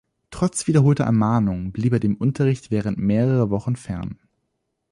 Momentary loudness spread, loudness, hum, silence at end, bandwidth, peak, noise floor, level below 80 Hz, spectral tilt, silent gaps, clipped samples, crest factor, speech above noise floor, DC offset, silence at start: 10 LU; -21 LUFS; none; 0.75 s; 11.5 kHz; -4 dBFS; -75 dBFS; -46 dBFS; -7.5 dB/octave; none; under 0.1%; 16 dB; 55 dB; under 0.1%; 0.3 s